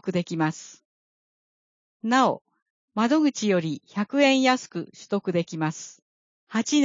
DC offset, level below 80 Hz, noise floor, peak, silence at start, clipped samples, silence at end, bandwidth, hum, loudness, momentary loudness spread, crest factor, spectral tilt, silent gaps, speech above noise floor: under 0.1%; -76 dBFS; under -90 dBFS; -6 dBFS; 0.05 s; under 0.1%; 0 s; 7.6 kHz; none; -24 LUFS; 15 LU; 20 dB; -4.5 dB/octave; 0.85-2.00 s, 2.62-2.88 s, 6.02-6.47 s; over 66 dB